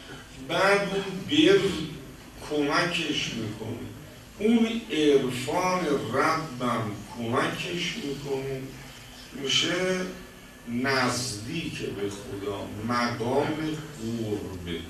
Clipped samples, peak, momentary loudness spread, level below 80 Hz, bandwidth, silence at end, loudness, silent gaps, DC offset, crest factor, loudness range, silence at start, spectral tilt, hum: under 0.1%; -8 dBFS; 19 LU; -54 dBFS; 13.5 kHz; 0 s; -27 LUFS; none; under 0.1%; 20 dB; 5 LU; 0 s; -4.5 dB/octave; none